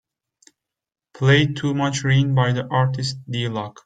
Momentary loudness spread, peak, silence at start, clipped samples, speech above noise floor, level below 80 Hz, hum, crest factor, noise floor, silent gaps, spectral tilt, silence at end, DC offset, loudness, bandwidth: 9 LU; -4 dBFS; 1.15 s; under 0.1%; 39 dB; -54 dBFS; none; 18 dB; -59 dBFS; none; -6 dB/octave; 0.15 s; under 0.1%; -20 LUFS; 9.2 kHz